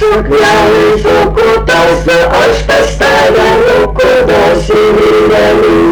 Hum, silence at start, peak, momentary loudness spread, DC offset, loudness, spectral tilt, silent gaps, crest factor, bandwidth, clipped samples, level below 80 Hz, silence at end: none; 0 s; -4 dBFS; 2 LU; 0.4%; -7 LUFS; -5 dB/octave; none; 2 dB; 19.5 kHz; under 0.1%; -22 dBFS; 0 s